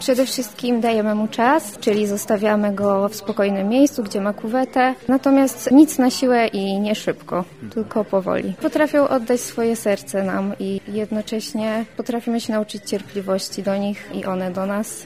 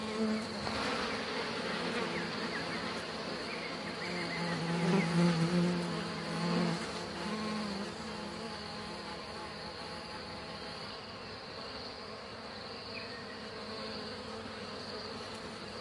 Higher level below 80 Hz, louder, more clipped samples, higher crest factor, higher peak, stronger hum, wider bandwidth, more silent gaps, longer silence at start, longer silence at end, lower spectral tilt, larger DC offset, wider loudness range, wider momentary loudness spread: first, -58 dBFS vs -64 dBFS; first, -20 LUFS vs -37 LUFS; neither; about the same, 18 dB vs 20 dB; first, -2 dBFS vs -18 dBFS; neither; first, 16 kHz vs 11.5 kHz; neither; about the same, 0 s vs 0 s; about the same, 0 s vs 0 s; about the same, -5 dB/octave vs -5 dB/octave; first, 0.2% vs under 0.1%; second, 7 LU vs 10 LU; second, 9 LU vs 12 LU